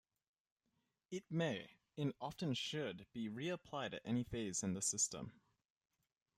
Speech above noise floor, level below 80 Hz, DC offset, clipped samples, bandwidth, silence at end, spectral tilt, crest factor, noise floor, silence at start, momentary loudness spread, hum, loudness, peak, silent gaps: 43 dB; -74 dBFS; under 0.1%; under 0.1%; 15 kHz; 1.05 s; -4 dB/octave; 20 dB; -86 dBFS; 1.1 s; 11 LU; none; -43 LUFS; -26 dBFS; none